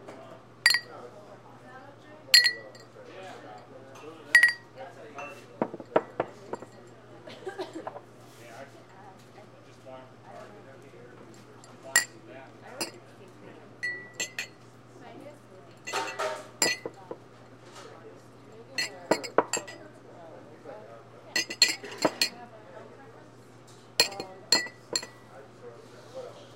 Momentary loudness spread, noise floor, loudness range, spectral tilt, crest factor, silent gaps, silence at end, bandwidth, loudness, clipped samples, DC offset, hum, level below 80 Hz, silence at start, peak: 26 LU; -52 dBFS; 18 LU; -1 dB/octave; 32 dB; none; 0 s; 16 kHz; -27 LUFS; under 0.1%; under 0.1%; none; -74 dBFS; 0 s; 0 dBFS